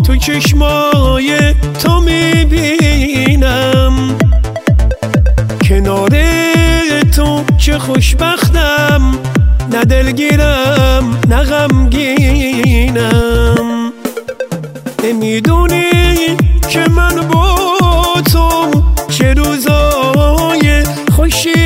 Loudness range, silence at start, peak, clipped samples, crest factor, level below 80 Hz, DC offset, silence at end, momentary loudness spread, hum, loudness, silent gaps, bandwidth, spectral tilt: 2 LU; 0 s; 0 dBFS; under 0.1%; 10 dB; -14 dBFS; under 0.1%; 0 s; 3 LU; none; -10 LUFS; none; 16.5 kHz; -5.5 dB/octave